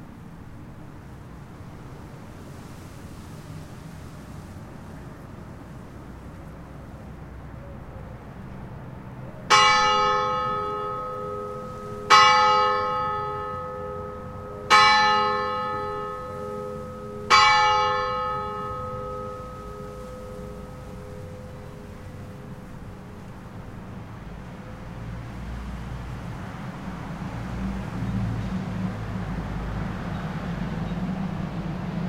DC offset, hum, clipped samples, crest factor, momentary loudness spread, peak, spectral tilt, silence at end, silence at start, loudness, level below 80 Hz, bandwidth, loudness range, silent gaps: under 0.1%; none; under 0.1%; 24 dB; 24 LU; -2 dBFS; -4 dB/octave; 0 s; 0 s; -23 LUFS; -44 dBFS; 16 kHz; 20 LU; none